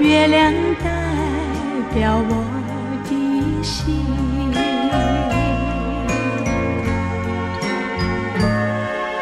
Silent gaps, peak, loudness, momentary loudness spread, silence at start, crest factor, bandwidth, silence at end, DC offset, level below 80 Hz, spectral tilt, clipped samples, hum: none; -4 dBFS; -20 LUFS; 6 LU; 0 s; 16 dB; 13 kHz; 0 s; under 0.1%; -30 dBFS; -6 dB/octave; under 0.1%; none